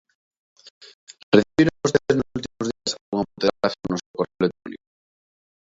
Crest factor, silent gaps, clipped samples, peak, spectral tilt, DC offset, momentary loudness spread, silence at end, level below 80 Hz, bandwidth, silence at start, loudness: 24 dB; 0.70-0.81 s, 0.94-1.07 s, 1.23-1.32 s, 3.01-3.12 s, 4.06-4.14 s; under 0.1%; 0 dBFS; -5 dB/octave; under 0.1%; 11 LU; 0.9 s; -54 dBFS; 7.8 kHz; 0.65 s; -23 LUFS